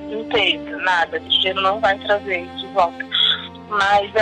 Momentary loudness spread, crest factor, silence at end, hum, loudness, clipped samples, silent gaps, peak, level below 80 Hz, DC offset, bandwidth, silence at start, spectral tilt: 7 LU; 14 dB; 0 s; none; -18 LUFS; under 0.1%; none; -6 dBFS; -52 dBFS; under 0.1%; 10 kHz; 0 s; -3.5 dB/octave